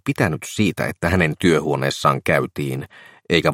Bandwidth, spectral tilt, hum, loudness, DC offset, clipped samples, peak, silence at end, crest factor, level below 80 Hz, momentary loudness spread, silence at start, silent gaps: 16.5 kHz; -5.5 dB/octave; none; -20 LUFS; under 0.1%; under 0.1%; -2 dBFS; 0 s; 18 dB; -46 dBFS; 9 LU; 0.05 s; none